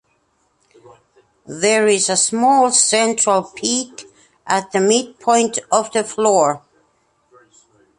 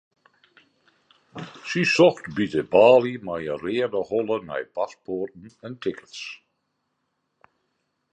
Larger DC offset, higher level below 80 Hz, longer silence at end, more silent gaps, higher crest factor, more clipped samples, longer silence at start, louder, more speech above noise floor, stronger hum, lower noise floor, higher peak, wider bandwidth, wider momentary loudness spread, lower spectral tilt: neither; about the same, -66 dBFS vs -64 dBFS; second, 1.4 s vs 1.75 s; neither; about the same, 18 dB vs 22 dB; neither; first, 1.5 s vs 1.35 s; first, -16 LUFS vs -22 LUFS; second, 47 dB vs 53 dB; neither; second, -63 dBFS vs -76 dBFS; about the same, 0 dBFS vs -2 dBFS; first, 11.5 kHz vs 8.8 kHz; second, 8 LU vs 22 LU; second, -2 dB/octave vs -5.5 dB/octave